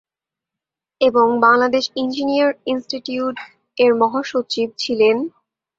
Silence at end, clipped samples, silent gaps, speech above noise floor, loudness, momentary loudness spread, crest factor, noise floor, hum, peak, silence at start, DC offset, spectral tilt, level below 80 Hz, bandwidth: 0.5 s; under 0.1%; none; 70 dB; -18 LUFS; 11 LU; 18 dB; -87 dBFS; none; -2 dBFS; 1 s; under 0.1%; -4 dB/octave; -64 dBFS; 7.8 kHz